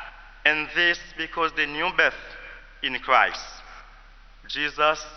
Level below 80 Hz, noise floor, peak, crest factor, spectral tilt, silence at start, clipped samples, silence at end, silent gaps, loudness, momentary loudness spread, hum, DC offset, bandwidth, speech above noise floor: -50 dBFS; -49 dBFS; -4 dBFS; 22 dB; -2.5 dB/octave; 0 s; under 0.1%; 0 s; none; -23 LUFS; 20 LU; none; under 0.1%; 6.6 kHz; 24 dB